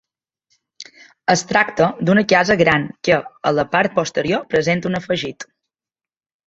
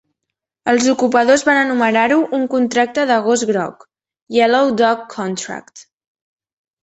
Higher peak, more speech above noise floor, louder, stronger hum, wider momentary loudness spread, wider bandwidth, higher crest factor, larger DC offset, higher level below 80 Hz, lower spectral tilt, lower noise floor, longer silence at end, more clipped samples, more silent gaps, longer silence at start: about the same, 0 dBFS vs 0 dBFS; first, over 73 dB vs 65 dB; about the same, -17 LUFS vs -15 LUFS; neither; about the same, 12 LU vs 11 LU; about the same, 8 kHz vs 8.4 kHz; about the same, 18 dB vs 16 dB; neither; first, -52 dBFS vs -62 dBFS; first, -5 dB/octave vs -3.5 dB/octave; first, under -90 dBFS vs -80 dBFS; about the same, 1.05 s vs 1 s; neither; second, none vs 4.22-4.26 s; first, 0.8 s vs 0.65 s